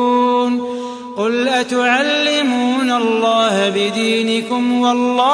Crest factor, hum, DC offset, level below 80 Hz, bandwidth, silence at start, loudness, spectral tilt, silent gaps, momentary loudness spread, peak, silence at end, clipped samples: 14 dB; none; under 0.1%; -66 dBFS; 11 kHz; 0 s; -15 LUFS; -3.5 dB/octave; none; 5 LU; -2 dBFS; 0 s; under 0.1%